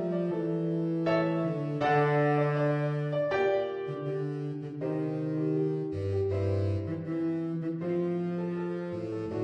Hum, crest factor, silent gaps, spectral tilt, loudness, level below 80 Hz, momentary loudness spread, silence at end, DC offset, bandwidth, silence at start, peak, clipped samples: none; 16 dB; none; -9 dB/octave; -30 LUFS; -66 dBFS; 8 LU; 0 s; under 0.1%; 8 kHz; 0 s; -14 dBFS; under 0.1%